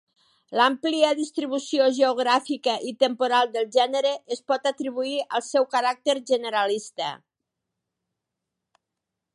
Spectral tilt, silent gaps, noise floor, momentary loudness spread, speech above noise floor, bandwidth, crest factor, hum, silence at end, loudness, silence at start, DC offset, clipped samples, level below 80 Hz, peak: -2 dB/octave; none; -84 dBFS; 7 LU; 61 dB; 11 kHz; 18 dB; none; 2.2 s; -24 LUFS; 0.5 s; under 0.1%; under 0.1%; -84 dBFS; -6 dBFS